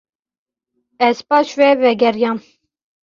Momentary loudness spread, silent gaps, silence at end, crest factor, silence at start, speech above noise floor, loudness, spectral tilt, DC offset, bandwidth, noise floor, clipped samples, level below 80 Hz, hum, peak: 7 LU; none; 0.65 s; 16 dB; 1 s; 57 dB; -15 LUFS; -4.5 dB/octave; under 0.1%; 7.4 kHz; -71 dBFS; under 0.1%; -64 dBFS; none; -2 dBFS